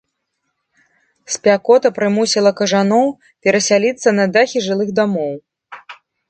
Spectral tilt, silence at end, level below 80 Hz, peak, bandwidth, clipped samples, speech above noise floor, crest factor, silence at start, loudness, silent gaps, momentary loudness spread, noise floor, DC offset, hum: -4 dB/octave; 0.35 s; -64 dBFS; 0 dBFS; 9.2 kHz; under 0.1%; 58 dB; 16 dB; 1.3 s; -15 LUFS; none; 11 LU; -72 dBFS; under 0.1%; none